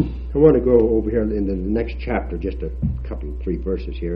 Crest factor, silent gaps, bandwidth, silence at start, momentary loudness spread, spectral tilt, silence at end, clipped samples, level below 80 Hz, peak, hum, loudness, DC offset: 18 dB; none; 5.4 kHz; 0 s; 12 LU; -11 dB/octave; 0 s; under 0.1%; -28 dBFS; -2 dBFS; none; -21 LUFS; under 0.1%